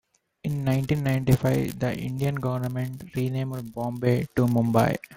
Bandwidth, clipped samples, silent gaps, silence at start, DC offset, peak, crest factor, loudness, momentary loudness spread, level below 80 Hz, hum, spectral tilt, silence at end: 16.5 kHz; under 0.1%; none; 0.45 s; under 0.1%; -6 dBFS; 18 dB; -26 LUFS; 10 LU; -50 dBFS; none; -7.5 dB/octave; 0 s